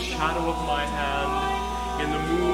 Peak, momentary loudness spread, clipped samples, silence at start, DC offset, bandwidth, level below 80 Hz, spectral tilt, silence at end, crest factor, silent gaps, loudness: -8 dBFS; 3 LU; under 0.1%; 0 s; under 0.1%; 16.5 kHz; -36 dBFS; -4.5 dB/octave; 0 s; 16 dB; none; -26 LUFS